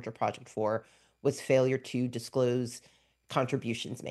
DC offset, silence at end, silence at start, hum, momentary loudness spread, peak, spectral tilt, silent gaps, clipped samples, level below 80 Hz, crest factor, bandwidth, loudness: under 0.1%; 0 s; 0 s; none; 9 LU; -10 dBFS; -6 dB/octave; none; under 0.1%; -72 dBFS; 20 dB; 12.5 kHz; -32 LUFS